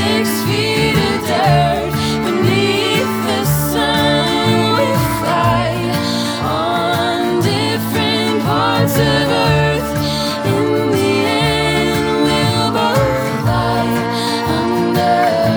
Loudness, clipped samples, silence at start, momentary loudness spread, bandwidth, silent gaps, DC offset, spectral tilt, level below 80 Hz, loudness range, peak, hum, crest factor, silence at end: -15 LUFS; under 0.1%; 0 s; 4 LU; over 20 kHz; none; under 0.1%; -5 dB/octave; -36 dBFS; 1 LU; 0 dBFS; none; 14 dB; 0 s